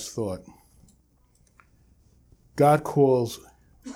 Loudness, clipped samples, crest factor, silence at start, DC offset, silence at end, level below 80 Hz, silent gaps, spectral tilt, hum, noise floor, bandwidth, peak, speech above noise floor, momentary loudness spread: -23 LUFS; under 0.1%; 20 dB; 0 s; under 0.1%; 0 s; -58 dBFS; none; -6.5 dB/octave; none; -62 dBFS; 16.5 kHz; -6 dBFS; 40 dB; 21 LU